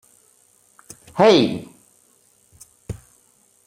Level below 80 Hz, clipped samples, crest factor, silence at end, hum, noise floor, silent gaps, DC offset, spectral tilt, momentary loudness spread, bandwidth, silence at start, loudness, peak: -54 dBFS; under 0.1%; 22 dB; 0.75 s; none; -58 dBFS; none; under 0.1%; -5.5 dB/octave; 23 LU; 15.5 kHz; 1.15 s; -17 LUFS; -2 dBFS